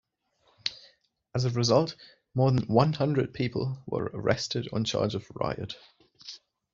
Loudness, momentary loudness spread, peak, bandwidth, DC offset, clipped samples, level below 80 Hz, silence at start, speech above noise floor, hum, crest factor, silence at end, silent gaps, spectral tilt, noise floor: -28 LUFS; 20 LU; -8 dBFS; 7.6 kHz; under 0.1%; under 0.1%; -58 dBFS; 0.65 s; 42 dB; none; 22 dB; 0.35 s; none; -5.5 dB/octave; -70 dBFS